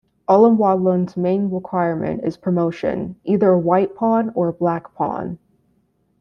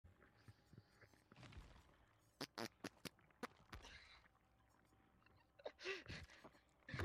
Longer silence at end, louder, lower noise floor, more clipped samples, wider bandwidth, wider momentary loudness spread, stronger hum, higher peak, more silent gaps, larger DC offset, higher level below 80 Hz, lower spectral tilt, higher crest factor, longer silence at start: first, 0.85 s vs 0 s; first, -19 LUFS vs -56 LUFS; second, -63 dBFS vs -77 dBFS; neither; second, 6.6 kHz vs 15.5 kHz; second, 10 LU vs 18 LU; neither; first, -2 dBFS vs -34 dBFS; neither; neither; first, -56 dBFS vs -72 dBFS; first, -10 dB/octave vs -4 dB/octave; second, 16 dB vs 24 dB; first, 0.3 s vs 0.05 s